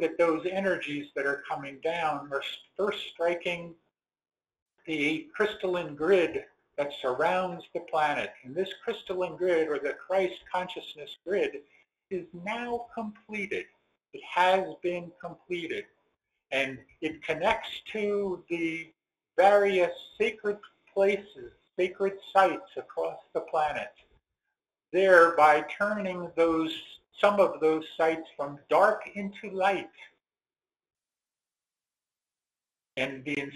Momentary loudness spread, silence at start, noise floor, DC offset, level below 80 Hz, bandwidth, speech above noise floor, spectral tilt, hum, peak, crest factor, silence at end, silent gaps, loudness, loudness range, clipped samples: 15 LU; 0 s; under -90 dBFS; under 0.1%; -68 dBFS; 13 kHz; over 62 dB; -5 dB/octave; none; -4 dBFS; 24 dB; 0 s; 4.62-4.66 s; -29 LUFS; 8 LU; under 0.1%